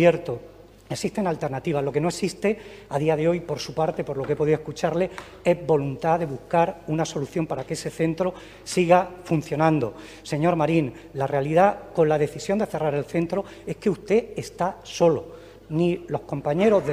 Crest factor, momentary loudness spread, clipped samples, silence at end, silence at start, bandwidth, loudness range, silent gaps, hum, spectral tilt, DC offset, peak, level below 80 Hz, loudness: 20 dB; 10 LU; under 0.1%; 0 s; 0 s; 15.5 kHz; 3 LU; none; none; -6.5 dB/octave; under 0.1%; -4 dBFS; -54 dBFS; -24 LUFS